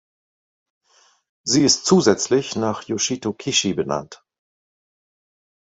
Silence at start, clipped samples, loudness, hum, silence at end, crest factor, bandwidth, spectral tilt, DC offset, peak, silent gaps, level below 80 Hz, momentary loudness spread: 1.45 s; under 0.1%; -19 LUFS; none; 1.55 s; 20 dB; 8.4 kHz; -3.5 dB/octave; under 0.1%; -2 dBFS; none; -58 dBFS; 10 LU